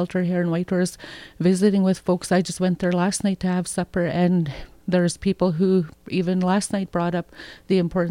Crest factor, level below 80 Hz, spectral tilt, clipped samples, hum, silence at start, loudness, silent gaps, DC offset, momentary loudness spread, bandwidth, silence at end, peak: 14 dB; -50 dBFS; -6 dB/octave; under 0.1%; none; 0 s; -22 LUFS; none; under 0.1%; 8 LU; 13.5 kHz; 0 s; -6 dBFS